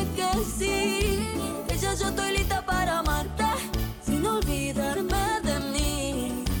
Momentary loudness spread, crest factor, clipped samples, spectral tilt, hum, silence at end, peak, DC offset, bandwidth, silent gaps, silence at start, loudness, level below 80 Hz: 4 LU; 14 dB; under 0.1%; -4 dB/octave; none; 0 s; -12 dBFS; under 0.1%; over 20 kHz; none; 0 s; -27 LUFS; -34 dBFS